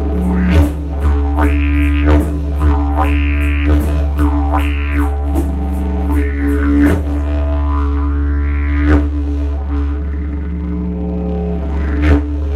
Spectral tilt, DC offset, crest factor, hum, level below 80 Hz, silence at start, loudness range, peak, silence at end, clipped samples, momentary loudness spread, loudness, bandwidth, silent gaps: -8.5 dB/octave; under 0.1%; 14 dB; none; -16 dBFS; 0 s; 3 LU; 0 dBFS; 0 s; under 0.1%; 6 LU; -16 LUFS; 4.4 kHz; none